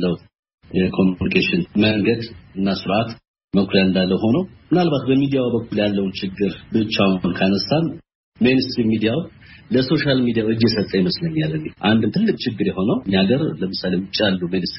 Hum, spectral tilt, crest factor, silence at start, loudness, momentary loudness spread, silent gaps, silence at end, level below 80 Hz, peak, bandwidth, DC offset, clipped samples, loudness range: none; -5 dB/octave; 18 dB; 0 s; -19 LUFS; 7 LU; 0.39-0.43 s, 0.54-0.58 s, 3.28-3.34 s, 3.44-3.48 s, 8.15-8.32 s; 0 s; -48 dBFS; 0 dBFS; 6 kHz; under 0.1%; under 0.1%; 1 LU